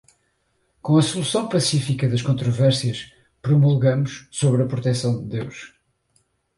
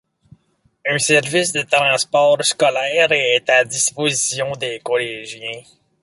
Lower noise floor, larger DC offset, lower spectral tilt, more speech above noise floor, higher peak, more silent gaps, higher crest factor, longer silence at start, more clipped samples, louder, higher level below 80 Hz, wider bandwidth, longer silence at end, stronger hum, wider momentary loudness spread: first, -68 dBFS vs -61 dBFS; neither; first, -6 dB/octave vs -2 dB/octave; first, 48 dB vs 43 dB; second, -6 dBFS vs -2 dBFS; neither; about the same, 16 dB vs 18 dB; about the same, 0.85 s vs 0.85 s; neither; second, -21 LUFS vs -16 LUFS; first, -56 dBFS vs -62 dBFS; about the same, 11.5 kHz vs 11.5 kHz; first, 0.9 s vs 0.4 s; neither; about the same, 14 LU vs 12 LU